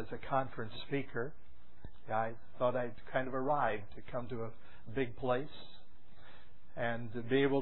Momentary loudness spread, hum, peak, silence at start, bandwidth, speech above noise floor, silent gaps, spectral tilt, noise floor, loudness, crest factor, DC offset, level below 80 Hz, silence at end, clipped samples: 18 LU; none; -20 dBFS; 0 s; 4 kHz; 25 dB; none; -4.5 dB/octave; -61 dBFS; -38 LUFS; 20 dB; 1%; -60 dBFS; 0 s; under 0.1%